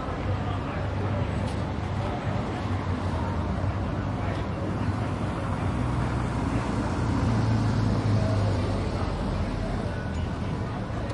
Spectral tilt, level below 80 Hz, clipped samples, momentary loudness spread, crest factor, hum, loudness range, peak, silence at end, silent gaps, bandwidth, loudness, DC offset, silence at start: -7.5 dB/octave; -36 dBFS; under 0.1%; 6 LU; 14 dB; none; 3 LU; -14 dBFS; 0 s; none; 11 kHz; -28 LUFS; under 0.1%; 0 s